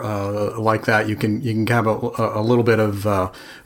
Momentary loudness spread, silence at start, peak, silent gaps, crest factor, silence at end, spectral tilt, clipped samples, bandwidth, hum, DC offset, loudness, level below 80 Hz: 6 LU; 0 s; -2 dBFS; none; 16 dB; 0.05 s; -7 dB/octave; under 0.1%; 17 kHz; none; under 0.1%; -20 LUFS; -52 dBFS